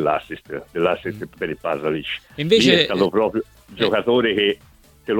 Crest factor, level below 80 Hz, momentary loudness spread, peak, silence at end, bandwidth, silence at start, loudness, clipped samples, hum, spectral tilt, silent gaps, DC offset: 20 dB; -52 dBFS; 16 LU; 0 dBFS; 0 s; 17 kHz; 0 s; -20 LUFS; under 0.1%; none; -5 dB/octave; none; under 0.1%